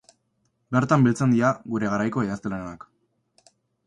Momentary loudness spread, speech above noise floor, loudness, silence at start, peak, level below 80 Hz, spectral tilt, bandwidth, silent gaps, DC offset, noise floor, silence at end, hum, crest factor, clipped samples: 14 LU; 49 dB; -23 LUFS; 0.7 s; -6 dBFS; -58 dBFS; -7.5 dB/octave; 10.5 kHz; none; under 0.1%; -72 dBFS; 1.1 s; none; 18 dB; under 0.1%